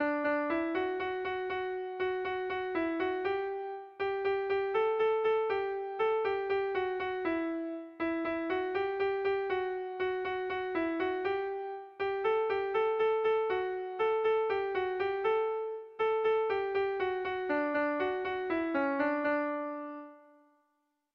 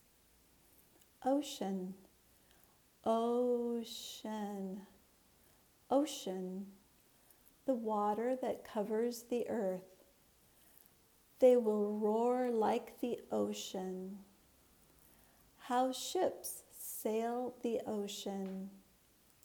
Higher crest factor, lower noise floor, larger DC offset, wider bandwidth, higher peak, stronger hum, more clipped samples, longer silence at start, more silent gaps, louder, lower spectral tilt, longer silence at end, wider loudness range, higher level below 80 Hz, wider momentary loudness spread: second, 14 dB vs 22 dB; first, -79 dBFS vs -69 dBFS; neither; second, 5.6 kHz vs over 20 kHz; about the same, -18 dBFS vs -18 dBFS; neither; neither; second, 0 s vs 1.2 s; neither; first, -32 LUFS vs -37 LUFS; first, -6.5 dB/octave vs -5 dB/octave; first, 0.95 s vs 0.65 s; second, 3 LU vs 7 LU; first, -68 dBFS vs -78 dBFS; second, 7 LU vs 12 LU